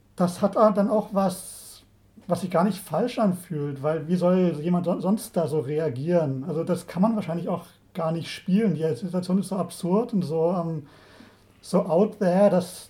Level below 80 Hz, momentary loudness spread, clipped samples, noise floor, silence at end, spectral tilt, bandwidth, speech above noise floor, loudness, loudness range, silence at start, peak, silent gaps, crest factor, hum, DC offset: -64 dBFS; 10 LU; under 0.1%; -53 dBFS; 0.05 s; -7.5 dB/octave; 16 kHz; 30 dB; -25 LUFS; 2 LU; 0.15 s; -6 dBFS; none; 20 dB; none; under 0.1%